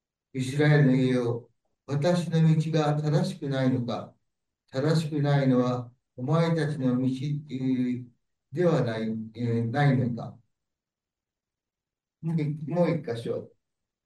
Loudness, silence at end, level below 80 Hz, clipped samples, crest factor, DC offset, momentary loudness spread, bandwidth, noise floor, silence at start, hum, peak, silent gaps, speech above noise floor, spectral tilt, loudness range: -27 LUFS; 0.6 s; -68 dBFS; under 0.1%; 16 dB; under 0.1%; 13 LU; 10.5 kHz; under -90 dBFS; 0.35 s; none; -10 dBFS; none; over 65 dB; -7.5 dB/octave; 7 LU